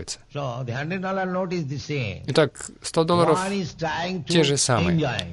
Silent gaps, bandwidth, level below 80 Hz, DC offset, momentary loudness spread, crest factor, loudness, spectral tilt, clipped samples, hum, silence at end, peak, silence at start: none; 11.5 kHz; -52 dBFS; under 0.1%; 10 LU; 18 dB; -24 LUFS; -4.5 dB/octave; under 0.1%; none; 0 s; -6 dBFS; 0 s